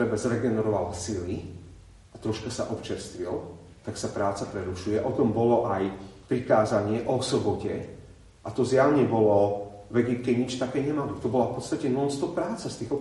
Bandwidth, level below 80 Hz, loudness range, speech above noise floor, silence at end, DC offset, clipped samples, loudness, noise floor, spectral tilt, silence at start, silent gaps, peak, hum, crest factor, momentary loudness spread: 11.5 kHz; -56 dBFS; 8 LU; 23 dB; 0 s; under 0.1%; under 0.1%; -27 LUFS; -49 dBFS; -6 dB/octave; 0 s; none; -8 dBFS; none; 18 dB; 13 LU